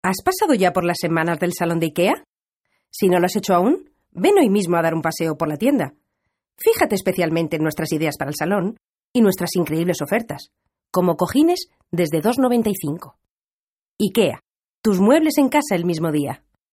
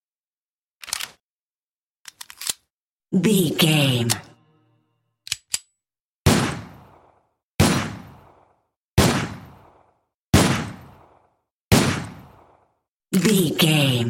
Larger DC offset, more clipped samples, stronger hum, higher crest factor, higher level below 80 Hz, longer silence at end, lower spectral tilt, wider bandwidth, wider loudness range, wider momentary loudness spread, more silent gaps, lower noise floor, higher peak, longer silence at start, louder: neither; neither; neither; about the same, 18 dB vs 22 dB; second, -56 dBFS vs -42 dBFS; first, 0.4 s vs 0 s; about the same, -5.5 dB/octave vs -4.5 dB/octave; about the same, 16 kHz vs 16.5 kHz; about the same, 3 LU vs 4 LU; second, 8 LU vs 18 LU; second, 2.28-2.33 s, 2.53-2.61 s, 9.04-9.14 s, 13.29-13.97 s, 14.50-14.54 s, 14.69-14.82 s vs 1.20-2.05 s, 2.70-2.98 s, 6.00-6.25 s, 7.45-7.58 s, 8.76-8.97 s, 10.14-10.33 s, 11.51-11.71 s, 12.88-13.00 s; about the same, under -90 dBFS vs under -90 dBFS; about the same, -2 dBFS vs -2 dBFS; second, 0.05 s vs 0.85 s; about the same, -20 LUFS vs -21 LUFS